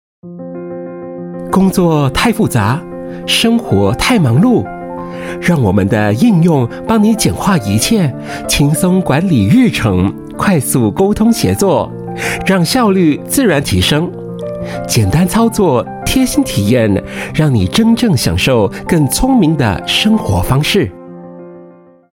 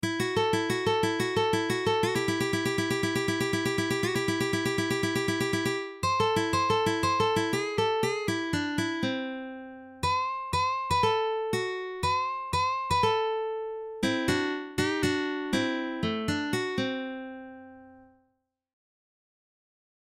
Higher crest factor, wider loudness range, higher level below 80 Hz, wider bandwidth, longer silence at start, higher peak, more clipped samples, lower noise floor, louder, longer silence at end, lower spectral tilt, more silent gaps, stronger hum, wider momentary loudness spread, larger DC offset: about the same, 12 dB vs 16 dB; second, 2 LU vs 5 LU; first, -32 dBFS vs -54 dBFS; about the same, 17 kHz vs 16.5 kHz; first, 0.25 s vs 0 s; first, 0 dBFS vs -14 dBFS; neither; second, -40 dBFS vs -76 dBFS; first, -12 LUFS vs -28 LUFS; second, 0.45 s vs 2 s; about the same, -5.5 dB/octave vs -4.5 dB/octave; neither; neither; first, 13 LU vs 7 LU; neither